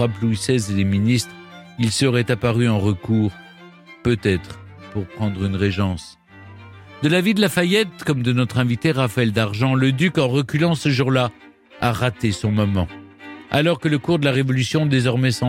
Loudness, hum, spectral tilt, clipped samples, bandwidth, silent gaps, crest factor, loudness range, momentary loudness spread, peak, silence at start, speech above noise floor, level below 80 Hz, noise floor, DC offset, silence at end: -20 LUFS; none; -6 dB/octave; under 0.1%; 16.5 kHz; none; 16 dB; 5 LU; 9 LU; -4 dBFS; 0 s; 25 dB; -48 dBFS; -44 dBFS; under 0.1%; 0 s